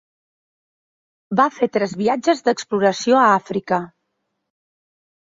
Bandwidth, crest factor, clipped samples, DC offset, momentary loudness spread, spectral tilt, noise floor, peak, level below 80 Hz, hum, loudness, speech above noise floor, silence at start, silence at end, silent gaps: 7.8 kHz; 18 dB; under 0.1%; under 0.1%; 9 LU; -5 dB/octave; -75 dBFS; -2 dBFS; -66 dBFS; none; -18 LUFS; 57 dB; 1.3 s; 1.35 s; none